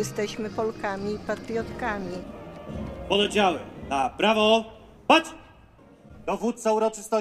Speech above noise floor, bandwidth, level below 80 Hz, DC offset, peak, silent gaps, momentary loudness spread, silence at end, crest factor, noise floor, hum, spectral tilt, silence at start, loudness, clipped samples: 27 dB; 14.5 kHz; -50 dBFS; under 0.1%; -4 dBFS; none; 17 LU; 0 s; 22 dB; -52 dBFS; none; -4 dB/octave; 0 s; -25 LUFS; under 0.1%